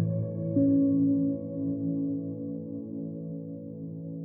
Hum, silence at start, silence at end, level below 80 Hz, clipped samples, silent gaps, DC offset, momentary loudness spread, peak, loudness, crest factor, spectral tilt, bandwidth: none; 0 s; 0 s; -66 dBFS; under 0.1%; none; under 0.1%; 15 LU; -16 dBFS; -30 LUFS; 14 dB; -16 dB/octave; 1.2 kHz